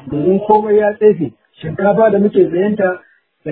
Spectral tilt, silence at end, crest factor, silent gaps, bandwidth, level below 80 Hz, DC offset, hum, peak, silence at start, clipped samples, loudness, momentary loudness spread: -12.5 dB/octave; 0 s; 14 dB; none; 4 kHz; -52 dBFS; under 0.1%; none; 0 dBFS; 0.05 s; under 0.1%; -13 LUFS; 15 LU